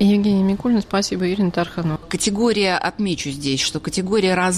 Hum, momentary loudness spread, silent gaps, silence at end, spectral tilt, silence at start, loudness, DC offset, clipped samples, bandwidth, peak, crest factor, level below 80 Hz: none; 6 LU; none; 0 s; -4.5 dB/octave; 0 s; -20 LUFS; under 0.1%; under 0.1%; 13.5 kHz; -6 dBFS; 14 dB; -46 dBFS